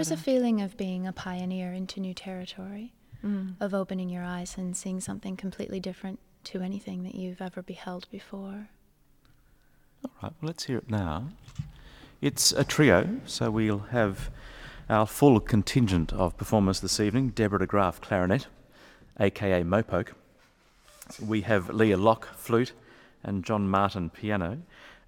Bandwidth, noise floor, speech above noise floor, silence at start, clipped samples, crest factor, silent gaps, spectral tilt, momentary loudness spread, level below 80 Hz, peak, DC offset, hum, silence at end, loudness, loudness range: 18 kHz; -62 dBFS; 34 dB; 0 s; under 0.1%; 24 dB; none; -5 dB/octave; 18 LU; -48 dBFS; -6 dBFS; under 0.1%; none; 0.15 s; -28 LUFS; 13 LU